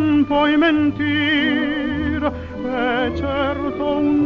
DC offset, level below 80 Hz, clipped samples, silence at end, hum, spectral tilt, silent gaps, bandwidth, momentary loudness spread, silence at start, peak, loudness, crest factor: under 0.1%; -38 dBFS; under 0.1%; 0 s; none; -7.5 dB/octave; none; 5.8 kHz; 7 LU; 0 s; -6 dBFS; -19 LUFS; 12 dB